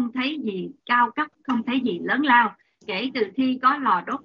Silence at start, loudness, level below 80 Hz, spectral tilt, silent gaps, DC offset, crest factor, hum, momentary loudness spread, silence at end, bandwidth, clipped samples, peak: 0 s; -22 LUFS; -72 dBFS; -2 dB/octave; none; under 0.1%; 20 dB; none; 11 LU; 0.05 s; 6.6 kHz; under 0.1%; -4 dBFS